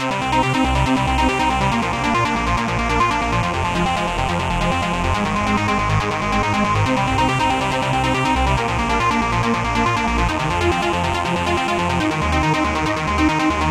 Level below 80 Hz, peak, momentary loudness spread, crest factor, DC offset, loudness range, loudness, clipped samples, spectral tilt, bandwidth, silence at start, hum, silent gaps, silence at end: -30 dBFS; -4 dBFS; 2 LU; 14 dB; under 0.1%; 1 LU; -18 LUFS; under 0.1%; -5 dB/octave; 15.5 kHz; 0 s; none; none; 0 s